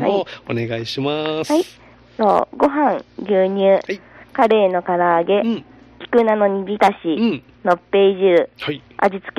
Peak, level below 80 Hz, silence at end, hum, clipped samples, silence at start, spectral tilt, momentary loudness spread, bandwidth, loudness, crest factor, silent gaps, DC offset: 0 dBFS; -56 dBFS; 0.1 s; none; under 0.1%; 0 s; -6 dB/octave; 11 LU; 12.5 kHz; -18 LUFS; 16 dB; none; under 0.1%